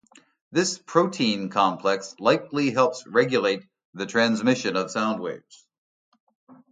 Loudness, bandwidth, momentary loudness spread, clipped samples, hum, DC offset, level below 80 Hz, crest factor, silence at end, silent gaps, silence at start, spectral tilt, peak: -24 LUFS; 9.6 kHz; 7 LU; under 0.1%; none; under 0.1%; -70 dBFS; 20 dB; 0.2 s; 3.85-3.93 s, 5.78-6.12 s, 6.20-6.27 s, 6.35-6.47 s; 0.5 s; -4.5 dB/octave; -4 dBFS